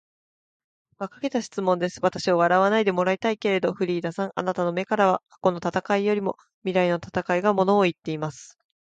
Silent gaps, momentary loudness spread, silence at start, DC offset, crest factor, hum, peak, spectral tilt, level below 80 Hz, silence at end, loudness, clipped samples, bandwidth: 6.54-6.62 s; 10 LU; 1 s; under 0.1%; 18 dB; none; -6 dBFS; -6 dB/octave; -64 dBFS; 0.35 s; -24 LUFS; under 0.1%; 9.2 kHz